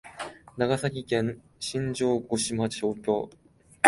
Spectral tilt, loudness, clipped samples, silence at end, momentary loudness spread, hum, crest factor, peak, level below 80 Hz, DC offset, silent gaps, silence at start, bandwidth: -4.5 dB/octave; -29 LUFS; under 0.1%; 0 s; 12 LU; none; 26 dB; -2 dBFS; -60 dBFS; under 0.1%; none; 0.05 s; 12 kHz